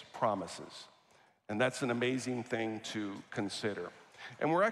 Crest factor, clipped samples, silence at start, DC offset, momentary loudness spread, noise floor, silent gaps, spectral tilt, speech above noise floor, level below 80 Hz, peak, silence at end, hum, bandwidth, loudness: 18 dB; under 0.1%; 0 s; under 0.1%; 17 LU; -67 dBFS; none; -5 dB/octave; 32 dB; -80 dBFS; -18 dBFS; 0 s; none; 13.5 kHz; -36 LUFS